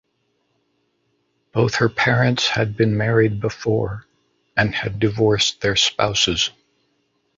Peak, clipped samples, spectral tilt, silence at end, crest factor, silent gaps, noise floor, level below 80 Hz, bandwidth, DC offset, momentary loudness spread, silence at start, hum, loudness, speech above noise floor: -2 dBFS; under 0.1%; -4.5 dB/octave; 0.9 s; 20 dB; none; -69 dBFS; -46 dBFS; 7.8 kHz; under 0.1%; 6 LU; 1.55 s; none; -19 LUFS; 50 dB